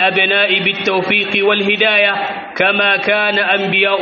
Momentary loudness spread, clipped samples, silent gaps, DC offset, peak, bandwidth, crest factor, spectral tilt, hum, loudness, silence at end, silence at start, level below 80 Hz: 4 LU; under 0.1%; none; under 0.1%; 0 dBFS; 6.8 kHz; 14 dB; -0.5 dB/octave; none; -13 LUFS; 0 s; 0 s; -60 dBFS